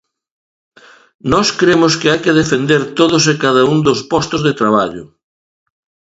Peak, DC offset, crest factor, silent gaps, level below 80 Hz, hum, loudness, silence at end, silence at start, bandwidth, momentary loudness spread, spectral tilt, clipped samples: 0 dBFS; under 0.1%; 14 dB; none; -46 dBFS; none; -13 LUFS; 1.1 s; 1.25 s; 8 kHz; 5 LU; -4.5 dB/octave; under 0.1%